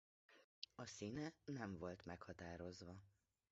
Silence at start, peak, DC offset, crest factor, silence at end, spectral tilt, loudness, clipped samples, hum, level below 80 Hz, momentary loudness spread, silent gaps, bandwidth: 0.3 s; -32 dBFS; under 0.1%; 24 dB; 0.4 s; -5 dB/octave; -53 LUFS; under 0.1%; none; -72 dBFS; 9 LU; 0.44-0.62 s; 7.6 kHz